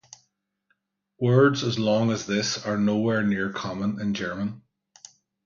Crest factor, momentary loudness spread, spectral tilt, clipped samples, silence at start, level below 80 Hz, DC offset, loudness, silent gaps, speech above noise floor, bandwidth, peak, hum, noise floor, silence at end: 20 dB; 10 LU; -5.5 dB/octave; under 0.1%; 1.2 s; -60 dBFS; under 0.1%; -24 LUFS; none; 50 dB; 7.4 kHz; -6 dBFS; none; -73 dBFS; 0.85 s